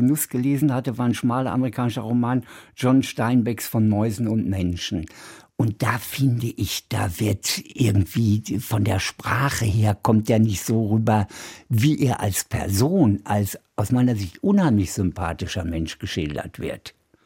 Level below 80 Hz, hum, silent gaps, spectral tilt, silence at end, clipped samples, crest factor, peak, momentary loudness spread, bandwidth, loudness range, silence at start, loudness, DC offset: -46 dBFS; none; none; -6 dB/octave; 0.35 s; under 0.1%; 16 dB; -6 dBFS; 8 LU; 17 kHz; 3 LU; 0 s; -22 LUFS; under 0.1%